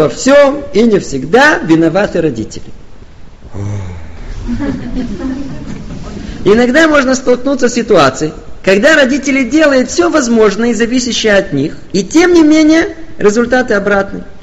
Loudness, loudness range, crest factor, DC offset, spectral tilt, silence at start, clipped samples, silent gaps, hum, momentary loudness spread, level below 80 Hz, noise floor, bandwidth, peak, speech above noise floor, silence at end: -10 LUFS; 12 LU; 10 dB; 3%; -4.5 dB/octave; 0 s; under 0.1%; none; none; 17 LU; -32 dBFS; -31 dBFS; 9.6 kHz; 0 dBFS; 21 dB; 0.05 s